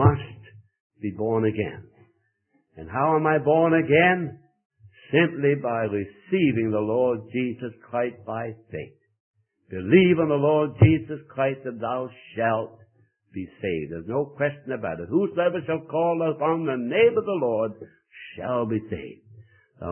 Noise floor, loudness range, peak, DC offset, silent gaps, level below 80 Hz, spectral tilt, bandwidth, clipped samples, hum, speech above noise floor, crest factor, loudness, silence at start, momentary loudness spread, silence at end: -69 dBFS; 6 LU; -2 dBFS; under 0.1%; 0.80-0.90 s, 4.65-4.70 s, 9.20-9.34 s; -54 dBFS; -11.5 dB/octave; 3.3 kHz; under 0.1%; none; 46 dB; 22 dB; -24 LUFS; 0 s; 17 LU; 0 s